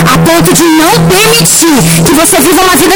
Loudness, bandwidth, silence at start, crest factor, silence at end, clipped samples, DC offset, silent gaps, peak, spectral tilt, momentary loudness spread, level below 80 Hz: -4 LUFS; over 20 kHz; 0 s; 4 dB; 0 s; 0.6%; under 0.1%; none; 0 dBFS; -3.5 dB/octave; 2 LU; -28 dBFS